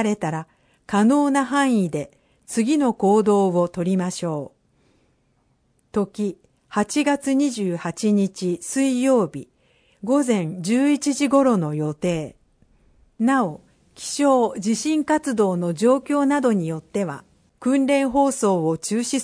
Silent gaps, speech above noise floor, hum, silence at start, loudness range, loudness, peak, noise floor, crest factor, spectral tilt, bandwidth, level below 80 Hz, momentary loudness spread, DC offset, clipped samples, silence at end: none; 44 dB; none; 0 s; 4 LU; -21 LUFS; -6 dBFS; -65 dBFS; 16 dB; -5.5 dB/octave; 10.5 kHz; -60 dBFS; 10 LU; under 0.1%; under 0.1%; 0 s